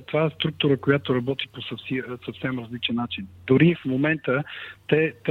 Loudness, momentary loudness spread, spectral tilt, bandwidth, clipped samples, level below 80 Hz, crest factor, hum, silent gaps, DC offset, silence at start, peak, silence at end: -24 LUFS; 13 LU; -8.5 dB/octave; 4.6 kHz; under 0.1%; -58 dBFS; 18 dB; none; none; under 0.1%; 0 s; -6 dBFS; 0 s